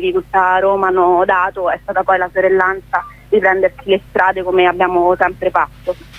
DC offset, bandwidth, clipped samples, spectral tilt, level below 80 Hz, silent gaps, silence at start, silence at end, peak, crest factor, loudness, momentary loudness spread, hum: under 0.1%; 5.2 kHz; under 0.1%; -6.5 dB/octave; -44 dBFS; none; 0 s; 0 s; 0 dBFS; 14 dB; -14 LUFS; 6 LU; none